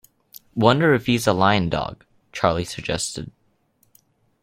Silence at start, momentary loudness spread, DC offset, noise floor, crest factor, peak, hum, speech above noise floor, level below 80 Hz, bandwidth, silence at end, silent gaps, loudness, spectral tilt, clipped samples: 0.55 s; 16 LU; under 0.1%; -64 dBFS; 22 dB; 0 dBFS; none; 44 dB; -48 dBFS; 16.5 kHz; 1.15 s; none; -20 LUFS; -5 dB/octave; under 0.1%